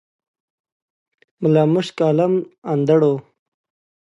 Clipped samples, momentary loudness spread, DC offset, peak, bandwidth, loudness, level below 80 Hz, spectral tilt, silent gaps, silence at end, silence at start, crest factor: under 0.1%; 8 LU; under 0.1%; -4 dBFS; 11 kHz; -18 LUFS; -68 dBFS; -8 dB/octave; 2.58-2.62 s; 0.95 s; 1.4 s; 16 dB